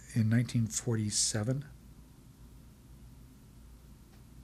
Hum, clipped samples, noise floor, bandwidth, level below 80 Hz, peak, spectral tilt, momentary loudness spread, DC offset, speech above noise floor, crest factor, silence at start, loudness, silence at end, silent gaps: none; under 0.1%; -55 dBFS; 14 kHz; -56 dBFS; -18 dBFS; -4.5 dB/octave; 13 LU; under 0.1%; 24 dB; 18 dB; 0 s; -31 LUFS; 0 s; none